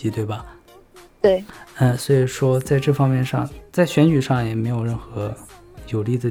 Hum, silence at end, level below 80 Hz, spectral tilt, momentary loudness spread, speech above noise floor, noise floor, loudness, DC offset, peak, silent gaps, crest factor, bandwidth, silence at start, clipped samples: none; 0 s; -46 dBFS; -7 dB/octave; 12 LU; 28 dB; -47 dBFS; -20 LUFS; under 0.1%; -2 dBFS; none; 18 dB; 16 kHz; 0 s; under 0.1%